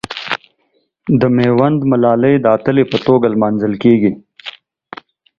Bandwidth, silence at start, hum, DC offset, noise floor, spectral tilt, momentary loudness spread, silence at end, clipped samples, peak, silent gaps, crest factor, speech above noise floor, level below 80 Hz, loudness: 7.4 kHz; 0.1 s; none; under 0.1%; -62 dBFS; -8.5 dB/octave; 19 LU; 0.9 s; under 0.1%; 0 dBFS; none; 14 dB; 50 dB; -50 dBFS; -13 LUFS